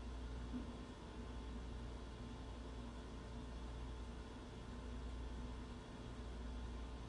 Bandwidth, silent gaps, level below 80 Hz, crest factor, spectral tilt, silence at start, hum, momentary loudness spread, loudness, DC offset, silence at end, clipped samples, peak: 11 kHz; none; -52 dBFS; 12 dB; -6 dB/octave; 0 s; none; 3 LU; -52 LUFS; under 0.1%; 0 s; under 0.1%; -36 dBFS